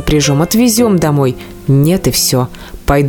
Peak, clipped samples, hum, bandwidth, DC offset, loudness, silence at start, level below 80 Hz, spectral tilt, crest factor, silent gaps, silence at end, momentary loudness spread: 0 dBFS; under 0.1%; none; 19 kHz; under 0.1%; -12 LUFS; 0 s; -28 dBFS; -5 dB/octave; 12 dB; none; 0 s; 9 LU